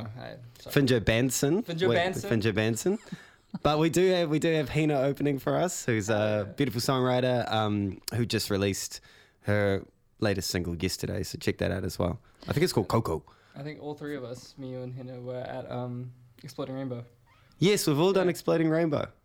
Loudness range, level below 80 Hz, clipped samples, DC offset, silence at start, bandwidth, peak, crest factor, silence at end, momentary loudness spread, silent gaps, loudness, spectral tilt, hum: 10 LU; -54 dBFS; under 0.1%; under 0.1%; 0 s; 19 kHz; -6 dBFS; 22 dB; 0.15 s; 16 LU; none; -28 LUFS; -5.5 dB/octave; none